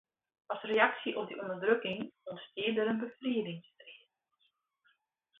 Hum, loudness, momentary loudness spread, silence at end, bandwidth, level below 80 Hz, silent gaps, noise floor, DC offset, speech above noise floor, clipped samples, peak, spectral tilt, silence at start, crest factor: none; -34 LUFS; 18 LU; 1.45 s; 4 kHz; -82 dBFS; none; -77 dBFS; under 0.1%; 44 dB; under 0.1%; -10 dBFS; -2.5 dB/octave; 0.5 s; 26 dB